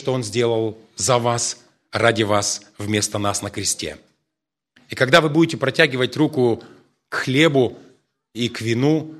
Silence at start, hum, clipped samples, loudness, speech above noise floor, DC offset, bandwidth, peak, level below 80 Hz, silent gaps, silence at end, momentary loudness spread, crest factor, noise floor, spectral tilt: 0 s; none; under 0.1%; -20 LUFS; 63 dB; under 0.1%; 13.5 kHz; 0 dBFS; -58 dBFS; none; 0 s; 12 LU; 20 dB; -83 dBFS; -4 dB/octave